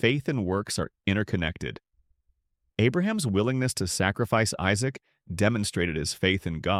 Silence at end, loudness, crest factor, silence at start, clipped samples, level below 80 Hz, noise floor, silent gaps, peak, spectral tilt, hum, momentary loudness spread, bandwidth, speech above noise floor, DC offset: 0 s; -27 LUFS; 18 dB; 0 s; under 0.1%; -50 dBFS; -72 dBFS; none; -8 dBFS; -5 dB/octave; none; 7 LU; 15.5 kHz; 46 dB; under 0.1%